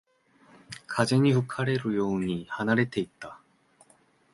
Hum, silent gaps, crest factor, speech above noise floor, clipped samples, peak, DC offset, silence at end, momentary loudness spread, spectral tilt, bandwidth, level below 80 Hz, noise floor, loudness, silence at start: none; none; 22 dB; 37 dB; under 0.1%; -6 dBFS; under 0.1%; 0.95 s; 21 LU; -6.5 dB/octave; 11.5 kHz; -62 dBFS; -63 dBFS; -27 LUFS; 0.7 s